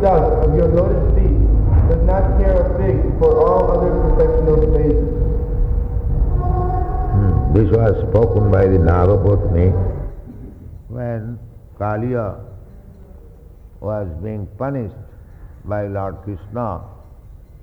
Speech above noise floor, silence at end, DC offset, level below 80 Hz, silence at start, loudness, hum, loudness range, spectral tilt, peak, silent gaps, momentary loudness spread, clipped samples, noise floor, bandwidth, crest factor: 25 dB; 0.25 s; under 0.1%; -20 dBFS; 0 s; -17 LUFS; none; 12 LU; -11.5 dB/octave; -2 dBFS; none; 15 LU; under 0.1%; -40 dBFS; 3.7 kHz; 14 dB